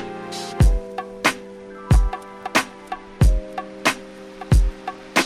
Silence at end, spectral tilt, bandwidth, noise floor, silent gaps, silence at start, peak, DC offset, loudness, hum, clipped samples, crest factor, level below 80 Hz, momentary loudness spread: 0 s; -5 dB/octave; 15 kHz; -37 dBFS; none; 0 s; -4 dBFS; under 0.1%; -22 LUFS; none; under 0.1%; 16 dB; -24 dBFS; 15 LU